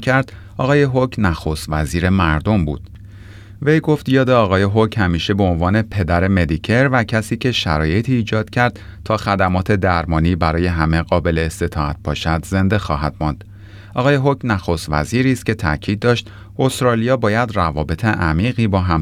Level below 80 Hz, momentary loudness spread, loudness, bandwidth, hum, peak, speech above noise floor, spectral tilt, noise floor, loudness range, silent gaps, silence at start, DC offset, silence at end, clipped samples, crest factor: -34 dBFS; 6 LU; -17 LUFS; 15 kHz; none; -2 dBFS; 20 dB; -6.5 dB/octave; -37 dBFS; 3 LU; none; 0 s; under 0.1%; 0 s; under 0.1%; 14 dB